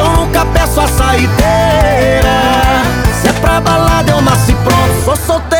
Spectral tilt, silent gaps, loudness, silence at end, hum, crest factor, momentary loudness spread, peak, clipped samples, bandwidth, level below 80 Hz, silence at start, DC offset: -5 dB/octave; none; -10 LUFS; 0 s; none; 10 dB; 2 LU; 0 dBFS; under 0.1%; over 20 kHz; -18 dBFS; 0 s; under 0.1%